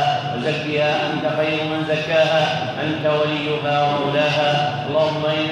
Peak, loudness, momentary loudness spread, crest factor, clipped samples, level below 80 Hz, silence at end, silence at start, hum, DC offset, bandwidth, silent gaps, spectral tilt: -6 dBFS; -19 LUFS; 4 LU; 14 dB; under 0.1%; -60 dBFS; 0 s; 0 s; none; under 0.1%; 9.6 kHz; none; -5.5 dB/octave